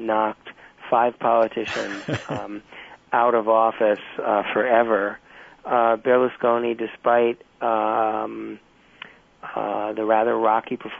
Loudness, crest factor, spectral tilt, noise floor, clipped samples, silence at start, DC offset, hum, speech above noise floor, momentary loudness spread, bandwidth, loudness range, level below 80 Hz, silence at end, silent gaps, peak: -22 LUFS; 16 dB; -6 dB/octave; -45 dBFS; under 0.1%; 0 s; under 0.1%; none; 24 dB; 21 LU; 8 kHz; 4 LU; -64 dBFS; 0 s; none; -6 dBFS